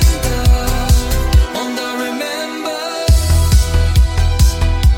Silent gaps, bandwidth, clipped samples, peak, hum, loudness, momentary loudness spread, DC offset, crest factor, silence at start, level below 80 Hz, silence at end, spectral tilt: none; 17 kHz; under 0.1%; 0 dBFS; none; -15 LUFS; 8 LU; under 0.1%; 12 dB; 0 s; -14 dBFS; 0 s; -5 dB/octave